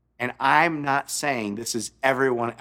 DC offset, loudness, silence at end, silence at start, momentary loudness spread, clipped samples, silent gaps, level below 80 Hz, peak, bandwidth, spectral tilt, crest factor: under 0.1%; -23 LUFS; 0.05 s; 0.2 s; 9 LU; under 0.1%; none; -64 dBFS; -4 dBFS; 17.5 kHz; -3.5 dB/octave; 20 dB